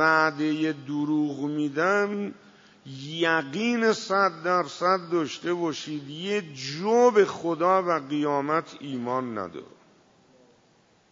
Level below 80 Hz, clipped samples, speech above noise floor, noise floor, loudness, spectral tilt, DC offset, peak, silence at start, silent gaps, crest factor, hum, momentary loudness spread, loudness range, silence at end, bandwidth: -78 dBFS; under 0.1%; 36 dB; -62 dBFS; -26 LUFS; -5 dB/octave; under 0.1%; -6 dBFS; 0 s; none; 20 dB; none; 12 LU; 3 LU; 1.45 s; 7.8 kHz